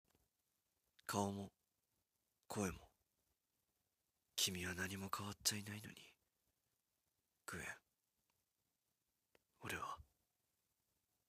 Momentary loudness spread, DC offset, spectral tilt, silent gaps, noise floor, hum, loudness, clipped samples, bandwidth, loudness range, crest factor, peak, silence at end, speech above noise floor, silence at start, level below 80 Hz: 17 LU; under 0.1%; -3 dB/octave; none; -90 dBFS; none; -45 LUFS; under 0.1%; 15.5 kHz; 13 LU; 28 dB; -22 dBFS; 1.25 s; 44 dB; 1.1 s; -74 dBFS